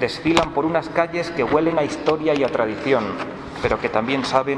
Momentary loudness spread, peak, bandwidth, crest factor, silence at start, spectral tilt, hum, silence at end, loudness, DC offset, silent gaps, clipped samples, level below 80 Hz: 5 LU; -2 dBFS; 11 kHz; 18 dB; 0 s; -5.5 dB/octave; none; 0 s; -21 LUFS; under 0.1%; none; under 0.1%; -46 dBFS